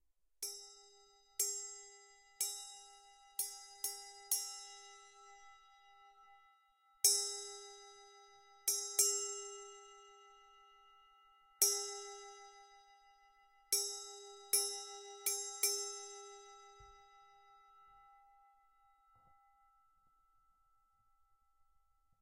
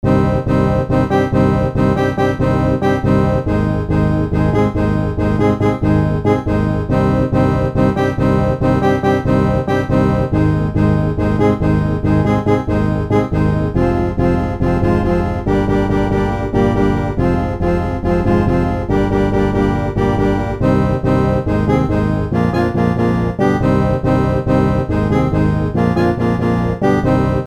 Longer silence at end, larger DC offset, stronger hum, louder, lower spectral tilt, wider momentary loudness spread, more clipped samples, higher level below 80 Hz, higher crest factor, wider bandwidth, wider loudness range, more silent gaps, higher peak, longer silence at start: first, 4.05 s vs 0 s; second, under 0.1% vs 0.4%; neither; second, -37 LUFS vs -15 LUFS; second, 2.5 dB/octave vs -9 dB/octave; first, 26 LU vs 2 LU; neither; second, -82 dBFS vs -26 dBFS; first, 32 dB vs 14 dB; first, 16 kHz vs 10.5 kHz; first, 7 LU vs 1 LU; neither; second, -12 dBFS vs -2 dBFS; first, 0.4 s vs 0.05 s